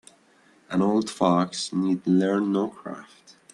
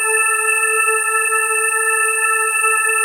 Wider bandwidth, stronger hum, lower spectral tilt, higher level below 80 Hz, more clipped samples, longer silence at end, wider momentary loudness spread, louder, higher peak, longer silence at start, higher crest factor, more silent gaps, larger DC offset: second, 11.5 kHz vs 16 kHz; neither; first, -6 dB/octave vs 4 dB/octave; first, -68 dBFS vs -78 dBFS; neither; first, 0.5 s vs 0 s; first, 13 LU vs 1 LU; second, -24 LUFS vs -14 LUFS; about the same, -6 dBFS vs -4 dBFS; first, 0.7 s vs 0 s; first, 20 dB vs 12 dB; neither; neither